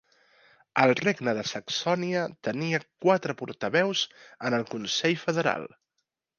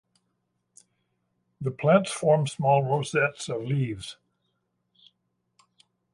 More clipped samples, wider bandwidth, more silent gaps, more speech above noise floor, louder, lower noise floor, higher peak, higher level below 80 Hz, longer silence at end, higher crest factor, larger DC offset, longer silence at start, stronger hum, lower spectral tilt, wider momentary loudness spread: neither; second, 7.2 kHz vs 11.5 kHz; neither; about the same, 54 dB vs 52 dB; about the same, -27 LUFS vs -25 LUFS; first, -81 dBFS vs -77 dBFS; about the same, -6 dBFS vs -6 dBFS; second, -74 dBFS vs -66 dBFS; second, 0.7 s vs 2 s; about the same, 22 dB vs 22 dB; neither; second, 0.75 s vs 1.6 s; neither; second, -4.5 dB/octave vs -6 dB/octave; second, 9 LU vs 12 LU